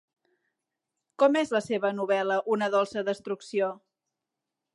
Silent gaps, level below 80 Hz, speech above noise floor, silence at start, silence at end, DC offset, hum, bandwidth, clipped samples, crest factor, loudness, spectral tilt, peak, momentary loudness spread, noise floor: none; -78 dBFS; 60 dB; 1.2 s; 0.95 s; under 0.1%; none; 11.5 kHz; under 0.1%; 20 dB; -27 LUFS; -5 dB/octave; -10 dBFS; 8 LU; -87 dBFS